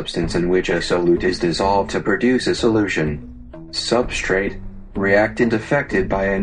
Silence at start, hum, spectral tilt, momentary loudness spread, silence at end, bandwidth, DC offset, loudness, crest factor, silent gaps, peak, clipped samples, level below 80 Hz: 0 s; none; -5 dB/octave; 10 LU; 0 s; 10 kHz; under 0.1%; -19 LUFS; 18 dB; none; -2 dBFS; under 0.1%; -34 dBFS